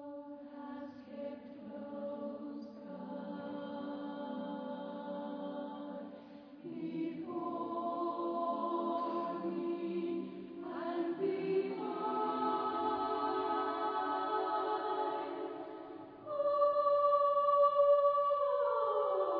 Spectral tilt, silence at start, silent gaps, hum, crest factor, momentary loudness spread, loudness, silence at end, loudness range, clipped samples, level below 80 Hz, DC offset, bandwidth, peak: -4.5 dB/octave; 0 s; none; none; 16 dB; 18 LU; -36 LUFS; 0 s; 13 LU; under 0.1%; -80 dBFS; under 0.1%; 5.2 kHz; -20 dBFS